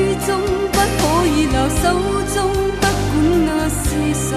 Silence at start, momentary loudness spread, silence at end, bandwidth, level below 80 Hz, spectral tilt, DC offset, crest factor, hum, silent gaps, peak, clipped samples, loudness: 0 s; 3 LU; 0 s; 14 kHz; -28 dBFS; -5 dB/octave; 0.2%; 14 dB; none; none; -2 dBFS; under 0.1%; -17 LUFS